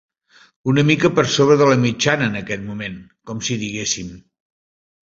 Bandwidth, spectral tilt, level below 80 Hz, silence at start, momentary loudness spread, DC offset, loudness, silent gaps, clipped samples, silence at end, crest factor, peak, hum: 7.8 kHz; -4.5 dB/octave; -52 dBFS; 0.65 s; 16 LU; under 0.1%; -18 LUFS; none; under 0.1%; 0.9 s; 18 dB; -2 dBFS; none